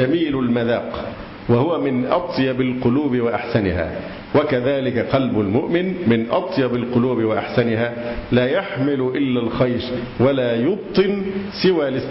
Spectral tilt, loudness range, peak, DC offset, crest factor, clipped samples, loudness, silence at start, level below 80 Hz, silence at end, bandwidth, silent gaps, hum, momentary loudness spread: -11 dB/octave; 1 LU; -6 dBFS; under 0.1%; 14 dB; under 0.1%; -20 LUFS; 0 s; -42 dBFS; 0 s; 5.8 kHz; none; none; 6 LU